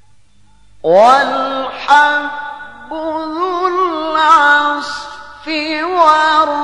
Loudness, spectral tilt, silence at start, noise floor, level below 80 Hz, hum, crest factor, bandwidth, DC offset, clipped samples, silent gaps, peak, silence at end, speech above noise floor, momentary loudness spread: -12 LUFS; -3 dB/octave; 0.85 s; -52 dBFS; -52 dBFS; none; 14 dB; 11 kHz; 0.6%; under 0.1%; none; 0 dBFS; 0 s; 40 dB; 17 LU